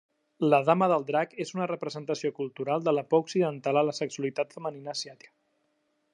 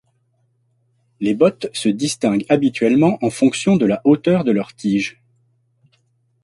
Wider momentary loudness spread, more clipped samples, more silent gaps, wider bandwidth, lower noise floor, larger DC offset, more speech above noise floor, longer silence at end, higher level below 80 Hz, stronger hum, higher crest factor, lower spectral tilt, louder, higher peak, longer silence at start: first, 11 LU vs 6 LU; neither; neither; about the same, 11 kHz vs 11.5 kHz; first, -74 dBFS vs -64 dBFS; neither; about the same, 47 dB vs 47 dB; second, 1 s vs 1.3 s; second, -82 dBFS vs -58 dBFS; neither; about the same, 22 dB vs 18 dB; about the same, -5.5 dB/octave vs -6 dB/octave; second, -28 LUFS vs -17 LUFS; second, -6 dBFS vs -2 dBFS; second, 0.4 s vs 1.2 s